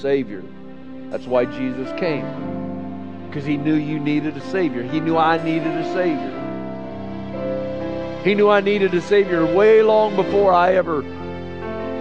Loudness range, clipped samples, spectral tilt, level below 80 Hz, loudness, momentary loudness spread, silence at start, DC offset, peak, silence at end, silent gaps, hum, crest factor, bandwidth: 8 LU; under 0.1%; -7.5 dB/octave; -52 dBFS; -19 LUFS; 16 LU; 0 s; 1%; -2 dBFS; 0 s; none; none; 18 dB; 8 kHz